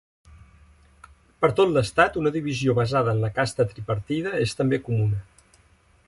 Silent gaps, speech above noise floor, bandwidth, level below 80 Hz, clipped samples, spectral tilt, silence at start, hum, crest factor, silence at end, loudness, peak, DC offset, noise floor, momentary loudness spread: none; 36 dB; 11.5 kHz; -50 dBFS; under 0.1%; -6.5 dB/octave; 1.4 s; none; 20 dB; 0.85 s; -23 LUFS; -6 dBFS; under 0.1%; -59 dBFS; 6 LU